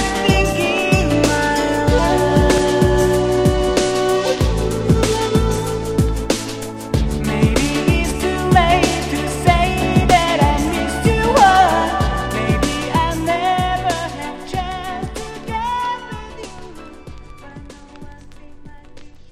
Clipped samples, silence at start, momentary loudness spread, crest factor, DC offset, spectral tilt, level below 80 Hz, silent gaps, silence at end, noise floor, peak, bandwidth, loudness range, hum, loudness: under 0.1%; 0 s; 13 LU; 16 dB; under 0.1%; -5 dB/octave; -26 dBFS; none; 0.1 s; -37 dBFS; 0 dBFS; 15.5 kHz; 11 LU; none; -17 LUFS